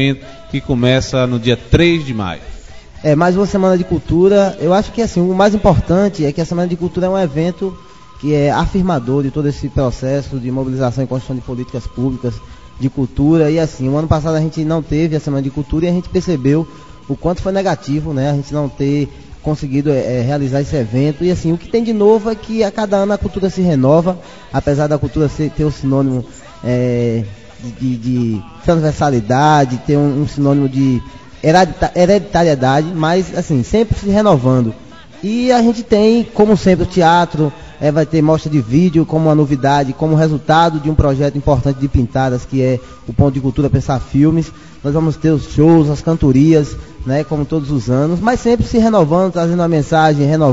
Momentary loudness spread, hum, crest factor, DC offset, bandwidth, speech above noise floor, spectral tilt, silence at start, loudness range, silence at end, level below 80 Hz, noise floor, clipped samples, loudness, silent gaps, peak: 9 LU; none; 14 dB; 0.8%; 7.8 kHz; 20 dB; -7.5 dB/octave; 0 s; 4 LU; 0 s; -32 dBFS; -33 dBFS; under 0.1%; -14 LUFS; none; 0 dBFS